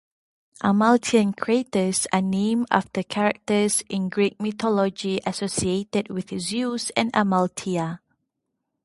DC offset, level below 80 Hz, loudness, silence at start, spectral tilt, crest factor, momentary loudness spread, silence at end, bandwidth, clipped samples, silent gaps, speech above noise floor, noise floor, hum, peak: under 0.1%; -58 dBFS; -23 LUFS; 0.65 s; -4.5 dB/octave; 24 dB; 7 LU; 0.85 s; 12 kHz; under 0.1%; none; 57 dB; -79 dBFS; none; 0 dBFS